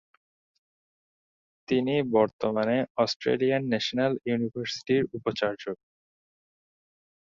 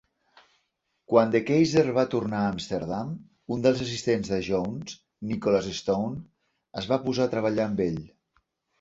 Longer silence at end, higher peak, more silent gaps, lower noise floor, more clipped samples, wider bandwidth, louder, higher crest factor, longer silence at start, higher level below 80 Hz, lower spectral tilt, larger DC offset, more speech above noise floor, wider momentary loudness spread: first, 1.45 s vs 0.75 s; second, -10 dBFS vs -4 dBFS; first, 2.33-2.39 s, 2.90-2.95 s, 3.16-3.20 s vs none; first, under -90 dBFS vs -76 dBFS; neither; about the same, 7.6 kHz vs 8 kHz; about the same, -27 LUFS vs -26 LUFS; about the same, 18 dB vs 22 dB; first, 1.7 s vs 1.1 s; second, -66 dBFS vs -56 dBFS; about the same, -6 dB/octave vs -6 dB/octave; neither; first, over 63 dB vs 51 dB; second, 6 LU vs 15 LU